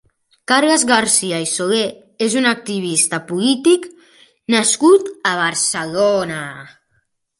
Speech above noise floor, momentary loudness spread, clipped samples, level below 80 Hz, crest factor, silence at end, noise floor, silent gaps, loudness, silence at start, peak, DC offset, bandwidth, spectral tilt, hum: 49 dB; 12 LU; under 0.1%; -62 dBFS; 18 dB; 0.7 s; -65 dBFS; none; -16 LUFS; 0.5 s; 0 dBFS; under 0.1%; 11.5 kHz; -2.5 dB/octave; none